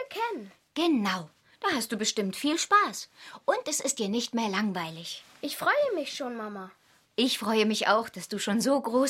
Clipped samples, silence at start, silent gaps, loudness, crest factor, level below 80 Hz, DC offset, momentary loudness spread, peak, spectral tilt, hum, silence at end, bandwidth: under 0.1%; 0 s; none; -28 LUFS; 20 dB; -74 dBFS; under 0.1%; 14 LU; -10 dBFS; -3 dB/octave; none; 0 s; 16.5 kHz